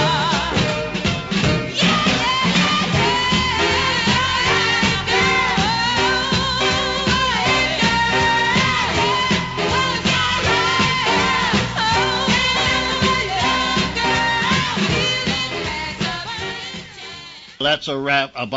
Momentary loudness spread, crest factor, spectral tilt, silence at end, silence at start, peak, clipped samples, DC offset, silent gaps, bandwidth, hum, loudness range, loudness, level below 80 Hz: 7 LU; 14 dB; -3.5 dB/octave; 0 s; 0 s; -4 dBFS; under 0.1%; under 0.1%; none; 8 kHz; none; 4 LU; -17 LUFS; -38 dBFS